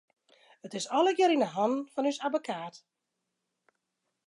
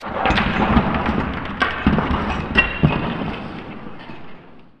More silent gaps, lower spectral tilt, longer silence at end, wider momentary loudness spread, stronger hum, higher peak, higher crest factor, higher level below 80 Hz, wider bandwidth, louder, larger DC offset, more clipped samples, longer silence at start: neither; second, -4 dB/octave vs -7 dB/octave; first, 1.5 s vs 0.1 s; second, 14 LU vs 18 LU; neither; second, -14 dBFS vs 0 dBFS; about the same, 18 dB vs 20 dB; second, -88 dBFS vs -30 dBFS; first, 11.5 kHz vs 9 kHz; second, -29 LUFS vs -19 LUFS; neither; neither; first, 0.65 s vs 0 s